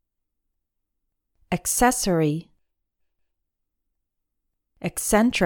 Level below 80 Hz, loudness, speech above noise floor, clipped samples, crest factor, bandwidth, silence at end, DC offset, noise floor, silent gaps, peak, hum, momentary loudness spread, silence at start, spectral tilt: -46 dBFS; -22 LUFS; 58 dB; under 0.1%; 22 dB; 19 kHz; 0 s; under 0.1%; -79 dBFS; none; -4 dBFS; none; 12 LU; 1.5 s; -4 dB/octave